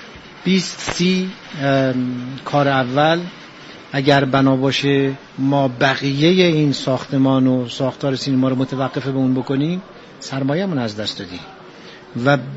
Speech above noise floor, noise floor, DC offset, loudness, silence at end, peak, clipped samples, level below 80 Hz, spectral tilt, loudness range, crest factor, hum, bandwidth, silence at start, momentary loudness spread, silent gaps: 22 dB; -39 dBFS; under 0.1%; -18 LUFS; 0 s; 0 dBFS; under 0.1%; -54 dBFS; -6 dB/octave; 5 LU; 18 dB; none; 8 kHz; 0 s; 16 LU; none